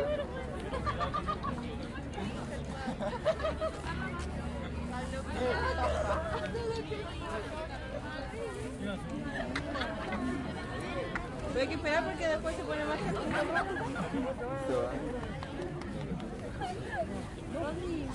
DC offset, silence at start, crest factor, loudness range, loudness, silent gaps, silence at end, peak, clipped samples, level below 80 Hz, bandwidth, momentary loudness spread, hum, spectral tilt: under 0.1%; 0 s; 18 dB; 4 LU; -36 LUFS; none; 0 s; -18 dBFS; under 0.1%; -46 dBFS; 11.5 kHz; 8 LU; none; -6 dB/octave